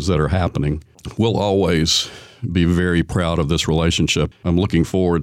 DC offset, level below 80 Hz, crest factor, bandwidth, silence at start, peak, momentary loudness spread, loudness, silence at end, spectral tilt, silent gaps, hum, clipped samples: under 0.1%; -32 dBFS; 12 dB; 15.5 kHz; 0 s; -6 dBFS; 7 LU; -18 LUFS; 0 s; -5.5 dB/octave; none; none; under 0.1%